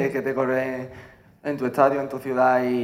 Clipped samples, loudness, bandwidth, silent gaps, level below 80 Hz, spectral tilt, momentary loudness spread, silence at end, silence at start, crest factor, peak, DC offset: under 0.1%; -23 LUFS; 15.5 kHz; none; -62 dBFS; -7 dB/octave; 13 LU; 0 s; 0 s; 20 dB; -4 dBFS; under 0.1%